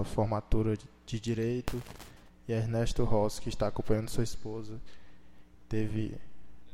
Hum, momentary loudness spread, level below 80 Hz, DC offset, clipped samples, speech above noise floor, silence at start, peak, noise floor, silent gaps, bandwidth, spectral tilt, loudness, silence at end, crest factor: none; 17 LU; -42 dBFS; under 0.1%; under 0.1%; 24 dB; 0 s; -12 dBFS; -55 dBFS; none; 15.5 kHz; -6.5 dB/octave; -34 LUFS; 0 s; 20 dB